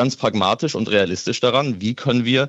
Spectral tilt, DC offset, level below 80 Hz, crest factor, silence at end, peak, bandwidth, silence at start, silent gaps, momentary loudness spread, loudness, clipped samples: -5 dB/octave; under 0.1%; -60 dBFS; 16 dB; 0 s; -4 dBFS; 8.2 kHz; 0 s; none; 3 LU; -19 LUFS; under 0.1%